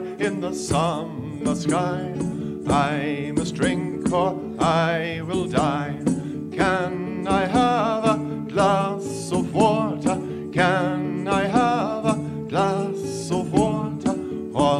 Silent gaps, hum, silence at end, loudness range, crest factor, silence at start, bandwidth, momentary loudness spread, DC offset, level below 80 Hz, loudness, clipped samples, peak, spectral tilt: none; none; 0 s; 2 LU; 18 dB; 0 s; 13 kHz; 8 LU; under 0.1%; -48 dBFS; -23 LUFS; under 0.1%; -4 dBFS; -6 dB/octave